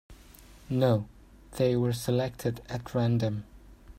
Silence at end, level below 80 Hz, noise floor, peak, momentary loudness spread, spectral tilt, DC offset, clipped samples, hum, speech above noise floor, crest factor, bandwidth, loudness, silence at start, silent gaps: 0.05 s; -54 dBFS; -52 dBFS; -12 dBFS; 12 LU; -7 dB/octave; under 0.1%; under 0.1%; none; 25 dB; 18 dB; 16 kHz; -29 LUFS; 0.1 s; none